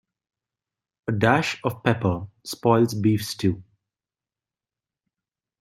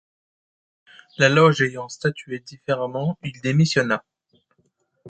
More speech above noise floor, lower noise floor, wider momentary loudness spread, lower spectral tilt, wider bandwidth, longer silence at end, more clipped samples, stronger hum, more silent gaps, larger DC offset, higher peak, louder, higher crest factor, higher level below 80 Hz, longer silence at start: first, over 68 dB vs 47 dB; first, under -90 dBFS vs -68 dBFS; second, 12 LU vs 16 LU; about the same, -6 dB/octave vs -5.5 dB/octave; first, 15 kHz vs 8.8 kHz; first, 2 s vs 0 s; neither; neither; neither; neither; about the same, -4 dBFS vs -2 dBFS; about the same, -23 LUFS vs -21 LUFS; about the same, 22 dB vs 20 dB; about the same, -58 dBFS vs -62 dBFS; second, 1.05 s vs 1.2 s